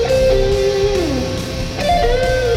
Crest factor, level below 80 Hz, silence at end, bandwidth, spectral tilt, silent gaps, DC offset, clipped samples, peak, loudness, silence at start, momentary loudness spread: 12 dB; -24 dBFS; 0 s; 16 kHz; -5 dB/octave; none; under 0.1%; under 0.1%; -2 dBFS; -16 LUFS; 0 s; 7 LU